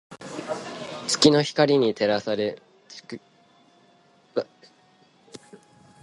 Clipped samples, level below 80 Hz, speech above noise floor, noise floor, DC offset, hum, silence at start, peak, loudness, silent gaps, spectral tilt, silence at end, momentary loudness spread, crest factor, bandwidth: under 0.1%; -66 dBFS; 38 dB; -59 dBFS; under 0.1%; none; 0.1 s; -2 dBFS; -23 LUFS; none; -4 dB/octave; 0.45 s; 26 LU; 24 dB; 11.5 kHz